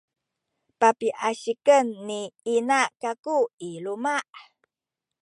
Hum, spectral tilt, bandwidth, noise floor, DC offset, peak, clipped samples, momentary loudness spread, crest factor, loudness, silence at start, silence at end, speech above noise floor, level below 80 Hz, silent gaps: none; -3 dB/octave; 11.5 kHz; -88 dBFS; under 0.1%; -4 dBFS; under 0.1%; 12 LU; 22 dB; -24 LUFS; 0.8 s; 0.8 s; 64 dB; -84 dBFS; 3.19-3.23 s, 3.53-3.58 s